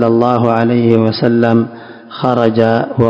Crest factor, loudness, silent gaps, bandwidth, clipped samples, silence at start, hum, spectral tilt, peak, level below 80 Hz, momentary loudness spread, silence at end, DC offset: 12 dB; -12 LUFS; none; 5.8 kHz; 1%; 0 s; none; -9 dB/octave; 0 dBFS; -46 dBFS; 6 LU; 0 s; 0.1%